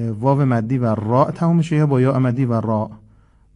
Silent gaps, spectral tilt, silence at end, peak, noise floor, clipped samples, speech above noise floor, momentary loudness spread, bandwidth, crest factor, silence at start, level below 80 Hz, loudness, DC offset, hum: none; -9.5 dB/octave; 0.6 s; -2 dBFS; -51 dBFS; under 0.1%; 34 dB; 4 LU; 10 kHz; 16 dB; 0 s; -50 dBFS; -18 LUFS; under 0.1%; none